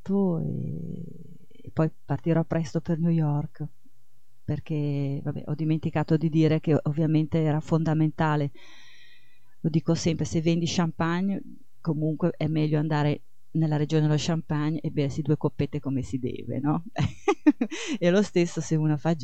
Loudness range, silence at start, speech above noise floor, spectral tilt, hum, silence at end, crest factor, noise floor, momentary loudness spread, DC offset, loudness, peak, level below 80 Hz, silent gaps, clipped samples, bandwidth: 4 LU; 0.05 s; 39 dB; -7 dB/octave; none; 0 s; 18 dB; -65 dBFS; 10 LU; 1%; -27 LUFS; -8 dBFS; -56 dBFS; none; under 0.1%; 8.4 kHz